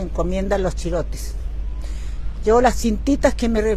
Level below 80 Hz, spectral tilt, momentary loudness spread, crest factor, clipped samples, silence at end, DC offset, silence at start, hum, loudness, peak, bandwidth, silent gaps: -26 dBFS; -6 dB/octave; 14 LU; 18 dB; under 0.1%; 0 s; under 0.1%; 0 s; none; -21 LUFS; -2 dBFS; 13.5 kHz; none